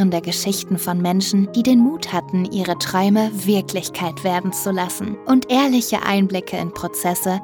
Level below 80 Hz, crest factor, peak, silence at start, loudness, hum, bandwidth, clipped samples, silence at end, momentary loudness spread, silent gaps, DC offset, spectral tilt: -56 dBFS; 14 dB; -4 dBFS; 0 s; -19 LUFS; none; over 20 kHz; under 0.1%; 0 s; 8 LU; none; under 0.1%; -5 dB/octave